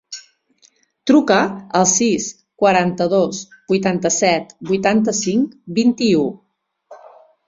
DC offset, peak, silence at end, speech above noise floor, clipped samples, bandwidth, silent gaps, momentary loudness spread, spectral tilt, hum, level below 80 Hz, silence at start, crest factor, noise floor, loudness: under 0.1%; -2 dBFS; 0.5 s; 40 dB; under 0.1%; 7.8 kHz; none; 9 LU; -4 dB/octave; none; -58 dBFS; 0.1 s; 16 dB; -57 dBFS; -17 LUFS